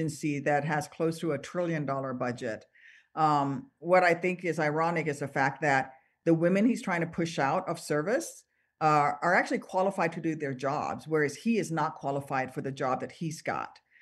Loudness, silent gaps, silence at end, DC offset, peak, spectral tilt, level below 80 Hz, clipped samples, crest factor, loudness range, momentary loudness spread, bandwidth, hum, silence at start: -29 LUFS; none; 0.3 s; under 0.1%; -10 dBFS; -6 dB/octave; -72 dBFS; under 0.1%; 18 dB; 4 LU; 9 LU; 12.5 kHz; none; 0 s